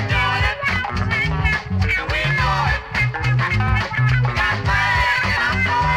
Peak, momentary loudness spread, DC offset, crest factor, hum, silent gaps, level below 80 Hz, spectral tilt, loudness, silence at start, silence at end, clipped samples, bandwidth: -6 dBFS; 3 LU; under 0.1%; 12 dB; none; none; -28 dBFS; -5.5 dB/octave; -18 LUFS; 0 s; 0 s; under 0.1%; 13 kHz